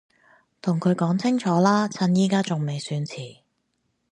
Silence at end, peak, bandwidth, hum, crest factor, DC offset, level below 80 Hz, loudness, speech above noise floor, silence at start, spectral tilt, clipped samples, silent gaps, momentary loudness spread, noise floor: 0.8 s; -6 dBFS; 10.5 kHz; none; 18 dB; under 0.1%; -70 dBFS; -23 LUFS; 51 dB; 0.65 s; -6.5 dB/octave; under 0.1%; none; 11 LU; -73 dBFS